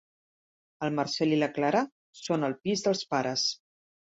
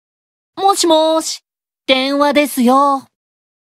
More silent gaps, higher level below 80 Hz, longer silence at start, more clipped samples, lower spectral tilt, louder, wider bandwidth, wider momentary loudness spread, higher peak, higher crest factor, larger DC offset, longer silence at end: first, 1.92-2.13 s vs none; second, -72 dBFS vs -60 dBFS; first, 0.8 s vs 0.55 s; neither; first, -4.5 dB/octave vs -2 dB/octave; second, -29 LUFS vs -14 LUFS; second, 8 kHz vs 16 kHz; about the same, 9 LU vs 11 LU; second, -12 dBFS vs 0 dBFS; about the same, 18 dB vs 16 dB; neither; second, 0.5 s vs 0.75 s